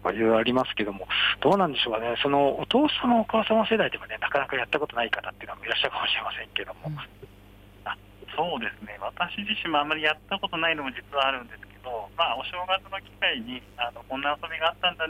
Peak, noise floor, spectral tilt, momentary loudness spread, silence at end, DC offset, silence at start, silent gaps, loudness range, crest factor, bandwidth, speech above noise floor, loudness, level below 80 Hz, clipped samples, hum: -10 dBFS; -51 dBFS; -5.5 dB/octave; 14 LU; 0 s; under 0.1%; 0 s; none; 7 LU; 18 dB; 16 kHz; 24 dB; -26 LUFS; -54 dBFS; under 0.1%; 50 Hz at -55 dBFS